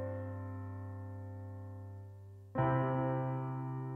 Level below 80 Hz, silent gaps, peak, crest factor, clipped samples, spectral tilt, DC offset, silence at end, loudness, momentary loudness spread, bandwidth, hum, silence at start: -66 dBFS; none; -20 dBFS; 18 dB; under 0.1%; -10.5 dB/octave; under 0.1%; 0 s; -39 LUFS; 16 LU; 3.3 kHz; 50 Hz at -75 dBFS; 0 s